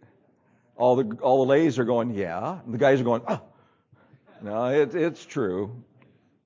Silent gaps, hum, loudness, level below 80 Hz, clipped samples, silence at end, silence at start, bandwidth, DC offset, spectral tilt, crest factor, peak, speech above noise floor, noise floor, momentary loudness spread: none; none; -24 LUFS; -64 dBFS; under 0.1%; 0.65 s; 0.8 s; 7.6 kHz; under 0.1%; -7 dB/octave; 18 dB; -8 dBFS; 40 dB; -63 dBFS; 11 LU